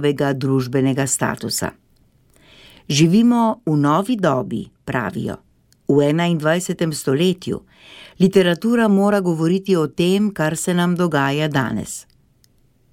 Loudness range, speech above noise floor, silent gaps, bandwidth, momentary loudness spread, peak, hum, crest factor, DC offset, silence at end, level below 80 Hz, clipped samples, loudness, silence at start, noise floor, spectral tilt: 3 LU; 39 dB; none; 16.5 kHz; 12 LU; -2 dBFS; none; 16 dB; under 0.1%; 0.9 s; -54 dBFS; under 0.1%; -18 LUFS; 0 s; -57 dBFS; -5.5 dB/octave